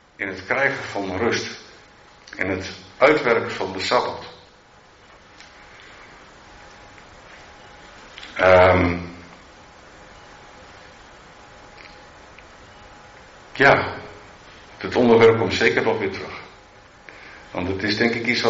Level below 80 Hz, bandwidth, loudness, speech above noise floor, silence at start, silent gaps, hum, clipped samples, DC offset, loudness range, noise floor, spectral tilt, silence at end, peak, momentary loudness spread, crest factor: -54 dBFS; 7.6 kHz; -19 LUFS; 32 dB; 0.2 s; none; none; under 0.1%; under 0.1%; 10 LU; -50 dBFS; -3 dB/octave; 0 s; -2 dBFS; 28 LU; 20 dB